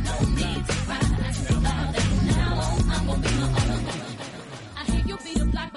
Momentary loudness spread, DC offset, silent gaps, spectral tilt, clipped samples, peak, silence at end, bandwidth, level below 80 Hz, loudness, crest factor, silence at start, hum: 9 LU; under 0.1%; none; -5.5 dB/octave; under 0.1%; -10 dBFS; 0 s; 11.5 kHz; -28 dBFS; -25 LUFS; 14 dB; 0 s; none